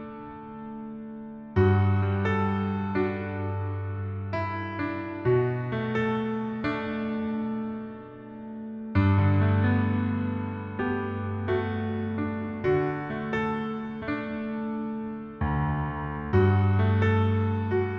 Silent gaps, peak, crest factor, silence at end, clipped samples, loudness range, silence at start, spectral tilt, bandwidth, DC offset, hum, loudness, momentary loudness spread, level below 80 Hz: none; -10 dBFS; 16 dB; 0 s; under 0.1%; 4 LU; 0 s; -10 dB/octave; 5.2 kHz; under 0.1%; none; -28 LUFS; 15 LU; -48 dBFS